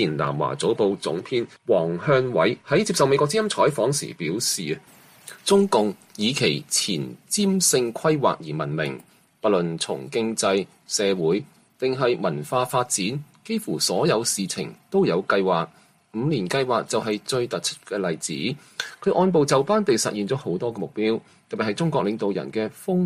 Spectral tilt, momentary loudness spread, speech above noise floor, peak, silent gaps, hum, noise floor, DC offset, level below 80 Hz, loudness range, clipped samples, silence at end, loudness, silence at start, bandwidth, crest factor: -4 dB/octave; 9 LU; 22 dB; -6 dBFS; none; none; -45 dBFS; under 0.1%; -64 dBFS; 3 LU; under 0.1%; 0 s; -23 LUFS; 0 s; 15.5 kHz; 18 dB